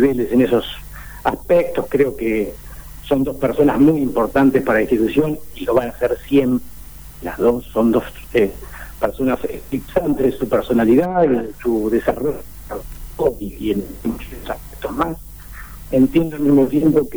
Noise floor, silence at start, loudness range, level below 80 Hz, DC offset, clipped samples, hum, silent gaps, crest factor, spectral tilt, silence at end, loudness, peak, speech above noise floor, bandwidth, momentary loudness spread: -37 dBFS; 0 s; 6 LU; -38 dBFS; 0.5%; under 0.1%; none; none; 14 dB; -7 dB/octave; 0 s; -18 LUFS; -4 dBFS; 19 dB; over 20 kHz; 17 LU